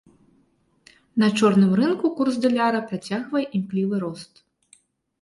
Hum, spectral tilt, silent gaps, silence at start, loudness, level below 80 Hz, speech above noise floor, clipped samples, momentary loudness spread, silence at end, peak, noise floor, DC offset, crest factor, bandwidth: none; -6.5 dB/octave; none; 1.15 s; -22 LUFS; -66 dBFS; 43 dB; under 0.1%; 11 LU; 0.95 s; -6 dBFS; -64 dBFS; under 0.1%; 16 dB; 11.5 kHz